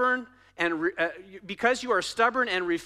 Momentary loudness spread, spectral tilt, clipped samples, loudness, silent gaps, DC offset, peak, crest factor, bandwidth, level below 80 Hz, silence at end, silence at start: 12 LU; -3 dB/octave; under 0.1%; -27 LUFS; none; under 0.1%; -10 dBFS; 16 dB; 13.5 kHz; -66 dBFS; 0 s; 0 s